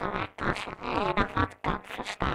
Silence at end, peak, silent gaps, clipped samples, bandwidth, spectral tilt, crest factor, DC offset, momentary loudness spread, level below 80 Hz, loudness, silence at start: 0 s; -8 dBFS; none; under 0.1%; 15.5 kHz; -5.5 dB/octave; 22 dB; under 0.1%; 6 LU; -42 dBFS; -30 LUFS; 0 s